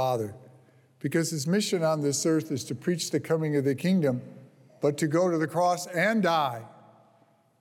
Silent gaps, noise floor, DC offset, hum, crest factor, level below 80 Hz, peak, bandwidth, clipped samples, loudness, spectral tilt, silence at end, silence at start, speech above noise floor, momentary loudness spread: none; -63 dBFS; under 0.1%; none; 14 dB; -76 dBFS; -12 dBFS; 17 kHz; under 0.1%; -27 LUFS; -5 dB/octave; 0.9 s; 0 s; 37 dB; 7 LU